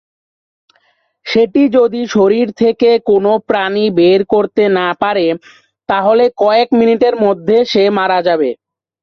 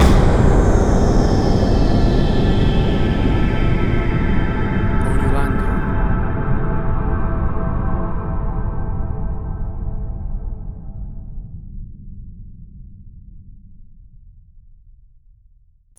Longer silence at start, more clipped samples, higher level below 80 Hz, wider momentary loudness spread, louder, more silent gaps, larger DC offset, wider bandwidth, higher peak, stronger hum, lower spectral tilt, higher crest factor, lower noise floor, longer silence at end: first, 1.25 s vs 0 s; neither; second, -54 dBFS vs -20 dBFS; second, 6 LU vs 19 LU; first, -12 LUFS vs -19 LUFS; neither; neither; second, 6.4 kHz vs 10.5 kHz; about the same, 0 dBFS vs -2 dBFS; neither; second, -6 dB/octave vs -7.5 dB/octave; about the same, 12 dB vs 16 dB; first, -58 dBFS vs -52 dBFS; second, 0.5 s vs 2.15 s